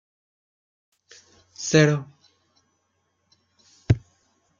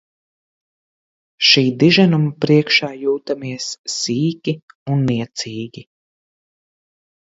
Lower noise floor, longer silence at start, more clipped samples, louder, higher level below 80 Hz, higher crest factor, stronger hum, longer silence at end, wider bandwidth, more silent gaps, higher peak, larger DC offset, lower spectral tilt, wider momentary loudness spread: second, -72 dBFS vs under -90 dBFS; first, 1.6 s vs 1.4 s; neither; second, -22 LUFS vs -17 LUFS; first, -52 dBFS vs -60 dBFS; about the same, 24 dB vs 20 dB; neither; second, 0.6 s vs 1.45 s; about the same, 7.4 kHz vs 8 kHz; second, none vs 3.78-3.84 s, 4.62-4.68 s, 4.75-4.86 s; second, -4 dBFS vs 0 dBFS; neither; about the same, -5.5 dB/octave vs -5 dB/octave; first, 24 LU vs 14 LU